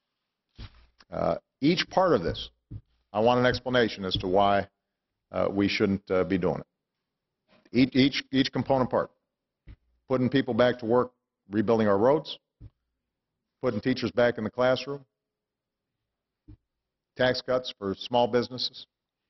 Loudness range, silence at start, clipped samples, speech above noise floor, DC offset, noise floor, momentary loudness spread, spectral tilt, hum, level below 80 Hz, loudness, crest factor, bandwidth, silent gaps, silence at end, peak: 4 LU; 0.6 s; under 0.1%; 62 dB; under 0.1%; -87 dBFS; 14 LU; -6.5 dB/octave; none; -54 dBFS; -26 LUFS; 20 dB; 6.2 kHz; none; 0.45 s; -8 dBFS